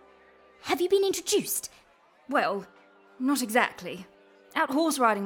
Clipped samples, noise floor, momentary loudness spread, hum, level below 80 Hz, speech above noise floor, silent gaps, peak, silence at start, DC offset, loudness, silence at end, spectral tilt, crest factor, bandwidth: under 0.1%; -60 dBFS; 15 LU; none; -72 dBFS; 34 dB; none; -8 dBFS; 0.65 s; under 0.1%; -27 LUFS; 0 s; -2.5 dB/octave; 20 dB; 19 kHz